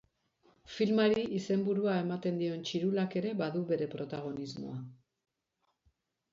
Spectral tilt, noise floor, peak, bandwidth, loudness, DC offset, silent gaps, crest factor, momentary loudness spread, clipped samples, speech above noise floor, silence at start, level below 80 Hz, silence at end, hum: -7 dB/octave; -81 dBFS; -18 dBFS; 7.6 kHz; -33 LUFS; under 0.1%; none; 16 dB; 13 LU; under 0.1%; 48 dB; 0.65 s; -74 dBFS; 1.4 s; none